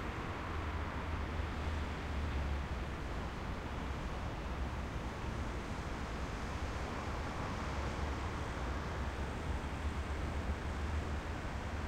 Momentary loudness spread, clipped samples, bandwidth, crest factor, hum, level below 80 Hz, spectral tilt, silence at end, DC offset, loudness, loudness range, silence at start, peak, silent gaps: 2 LU; under 0.1%; 12.5 kHz; 14 dB; none; -44 dBFS; -6 dB/octave; 0 s; under 0.1%; -41 LUFS; 1 LU; 0 s; -26 dBFS; none